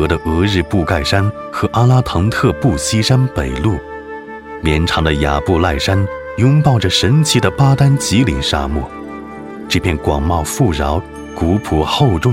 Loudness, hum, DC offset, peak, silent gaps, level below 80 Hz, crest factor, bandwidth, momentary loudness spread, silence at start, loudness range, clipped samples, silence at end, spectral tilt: -15 LUFS; none; under 0.1%; 0 dBFS; none; -28 dBFS; 14 dB; 16 kHz; 12 LU; 0 s; 4 LU; under 0.1%; 0 s; -5.5 dB/octave